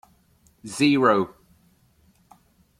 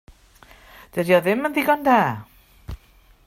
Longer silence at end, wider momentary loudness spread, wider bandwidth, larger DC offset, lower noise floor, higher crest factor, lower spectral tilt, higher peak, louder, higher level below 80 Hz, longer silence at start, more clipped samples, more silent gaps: first, 1.5 s vs 0.5 s; second, 19 LU vs 23 LU; second, 14.5 kHz vs 16.5 kHz; neither; first, -61 dBFS vs -54 dBFS; about the same, 20 dB vs 20 dB; about the same, -5 dB/octave vs -6 dB/octave; about the same, -6 dBFS vs -4 dBFS; about the same, -21 LUFS vs -20 LUFS; second, -64 dBFS vs -48 dBFS; second, 0.65 s vs 0.95 s; neither; neither